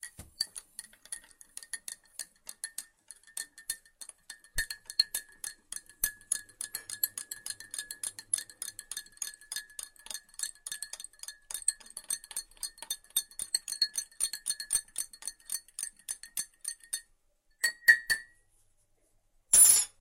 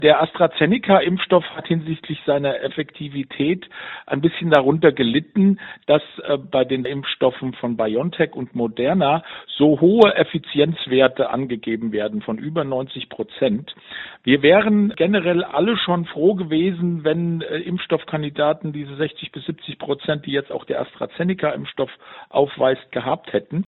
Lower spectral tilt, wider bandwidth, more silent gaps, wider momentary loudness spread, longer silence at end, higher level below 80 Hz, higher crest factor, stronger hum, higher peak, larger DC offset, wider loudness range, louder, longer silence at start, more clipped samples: second, 3 dB/octave vs -4.5 dB/octave; first, 16.5 kHz vs 4.6 kHz; neither; first, 18 LU vs 12 LU; about the same, 0.1 s vs 0.1 s; about the same, -60 dBFS vs -58 dBFS; first, 28 dB vs 20 dB; neither; second, -8 dBFS vs 0 dBFS; neither; first, 10 LU vs 6 LU; second, -31 LUFS vs -20 LUFS; about the same, 0.05 s vs 0 s; neither